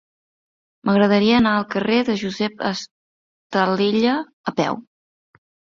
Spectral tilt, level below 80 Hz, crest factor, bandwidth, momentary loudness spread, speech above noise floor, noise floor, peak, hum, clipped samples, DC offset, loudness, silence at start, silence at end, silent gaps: -6 dB/octave; -56 dBFS; 18 dB; 7.4 kHz; 11 LU; over 71 dB; under -90 dBFS; -4 dBFS; none; under 0.1%; under 0.1%; -20 LUFS; 0.85 s; 0.95 s; 2.91-3.50 s, 4.33-4.44 s